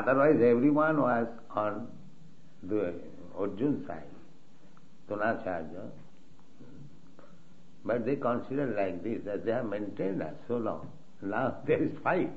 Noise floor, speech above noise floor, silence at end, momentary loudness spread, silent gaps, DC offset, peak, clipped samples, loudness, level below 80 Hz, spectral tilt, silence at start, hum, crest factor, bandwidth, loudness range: -59 dBFS; 30 dB; 0 s; 20 LU; none; 0.8%; -12 dBFS; under 0.1%; -31 LUFS; -68 dBFS; -9 dB/octave; 0 s; none; 20 dB; 7.4 kHz; 9 LU